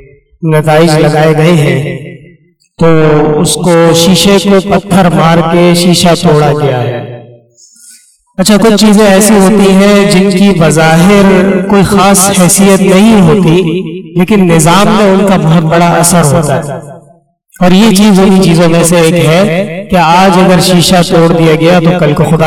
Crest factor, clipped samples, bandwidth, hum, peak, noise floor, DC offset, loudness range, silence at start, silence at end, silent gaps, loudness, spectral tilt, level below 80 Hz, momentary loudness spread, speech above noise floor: 6 dB; 2%; 16 kHz; none; 0 dBFS; -43 dBFS; under 0.1%; 3 LU; 0.4 s; 0 s; none; -5 LUFS; -5 dB/octave; -32 dBFS; 7 LU; 38 dB